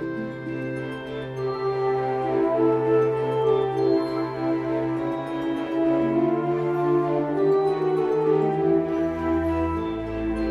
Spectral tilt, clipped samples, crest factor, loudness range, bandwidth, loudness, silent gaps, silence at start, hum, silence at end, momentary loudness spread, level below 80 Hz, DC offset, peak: -8.5 dB/octave; under 0.1%; 14 dB; 2 LU; 6.6 kHz; -24 LUFS; none; 0 s; none; 0 s; 8 LU; -46 dBFS; under 0.1%; -10 dBFS